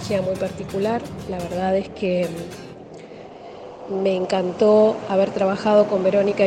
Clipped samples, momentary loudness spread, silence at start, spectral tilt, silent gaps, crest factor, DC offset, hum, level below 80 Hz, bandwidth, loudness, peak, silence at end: under 0.1%; 22 LU; 0 s; -6.5 dB/octave; none; 16 dB; under 0.1%; none; -52 dBFS; 13.5 kHz; -21 LUFS; -4 dBFS; 0 s